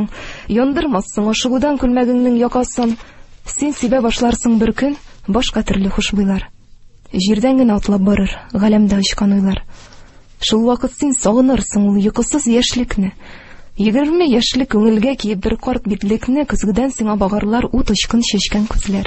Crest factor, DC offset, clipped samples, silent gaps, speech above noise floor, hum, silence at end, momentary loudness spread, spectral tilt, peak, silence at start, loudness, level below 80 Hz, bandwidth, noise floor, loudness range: 14 dB; under 0.1%; under 0.1%; none; 26 dB; none; 0 s; 7 LU; -5 dB/octave; 0 dBFS; 0 s; -15 LUFS; -30 dBFS; 8.6 kHz; -41 dBFS; 2 LU